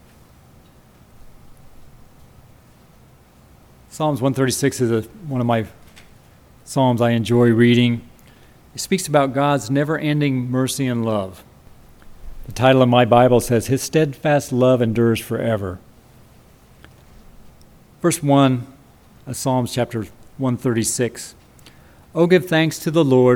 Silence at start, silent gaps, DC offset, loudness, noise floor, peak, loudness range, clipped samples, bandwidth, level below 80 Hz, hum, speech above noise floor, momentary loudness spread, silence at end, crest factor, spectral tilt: 1.25 s; none; under 0.1%; -18 LUFS; -49 dBFS; 0 dBFS; 7 LU; under 0.1%; 18.5 kHz; -48 dBFS; none; 32 dB; 15 LU; 0 s; 20 dB; -5.5 dB/octave